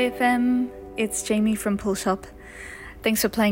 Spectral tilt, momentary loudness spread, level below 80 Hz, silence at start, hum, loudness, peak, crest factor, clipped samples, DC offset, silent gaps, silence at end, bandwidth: -4 dB/octave; 17 LU; -48 dBFS; 0 s; none; -24 LUFS; -8 dBFS; 14 dB; under 0.1%; under 0.1%; none; 0 s; 16.5 kHz